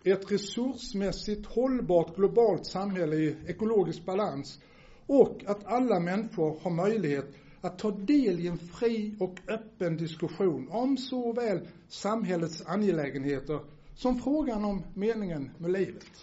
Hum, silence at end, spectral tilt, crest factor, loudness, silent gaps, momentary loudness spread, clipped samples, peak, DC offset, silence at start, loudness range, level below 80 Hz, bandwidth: none; 0 s; -6 dB/octave; 22 dB; -30 LUFS; none; 10 LU; under 0.1%; -8 dBFS; under 0.1%; 0.05 s; 3 LU; -54 dBFS; 8 kHz